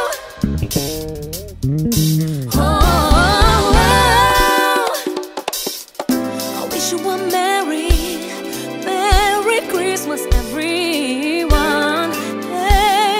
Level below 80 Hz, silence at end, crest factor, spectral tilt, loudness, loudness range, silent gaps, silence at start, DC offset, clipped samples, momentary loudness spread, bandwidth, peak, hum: -22 dBFS; 0 s; 16 dB; -4 dB/octave; -16 LUFS; 6 LU; none; 0 s; under 0.1%; under 0.1%; 11 LU; 16.5 kHz; 0 dBFS; none